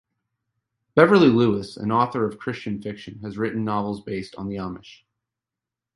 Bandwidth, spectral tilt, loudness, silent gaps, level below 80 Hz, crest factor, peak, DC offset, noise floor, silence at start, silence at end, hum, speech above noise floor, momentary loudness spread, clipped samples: 11.5 kHz; -7.5 dB/octave; -22 LUFS; none; -56 dBFS; 22 dB; 0 dBFS; under 0.1%; -88 dBFS; 0.95 s; 1.05 s; none; 66 dB; 18 LU; under 0.1%